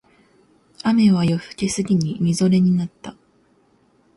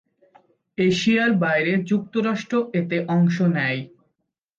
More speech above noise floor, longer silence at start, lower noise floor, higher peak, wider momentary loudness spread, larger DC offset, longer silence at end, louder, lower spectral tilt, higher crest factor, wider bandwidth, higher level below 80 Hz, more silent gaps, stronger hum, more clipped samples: second, 41 dB vs 56 dB; about the same, 0.85 s vs 0.8 s; second, -59 dBFS vs -77 dBFS; about the same, -6 dBFS vs -8 dBFS; first, 12 LU vs 6 LU; neither; first, 1.05 s vs 0.7 s; about the same, -19 LUFS vs -21 LUFS; about the same, -6.5 dB/octave vs -6.5 dB/octave; about the same, 14 dB vs 14 dB; first, 11.5 kHz vs 7.6 kHz; first, -54 dBFS vs -62 dBFS; neither; neither; neither